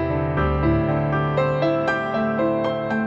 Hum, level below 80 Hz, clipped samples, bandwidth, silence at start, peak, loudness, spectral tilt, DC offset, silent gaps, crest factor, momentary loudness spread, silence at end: none; -34 dBFS; under 0.1%; 7.4 kHz; 0 s; -8 dBFS; -21 LUFS; -8.5 dB/octave; under 0.1%; none; 12 dB; 3 LU; 0 s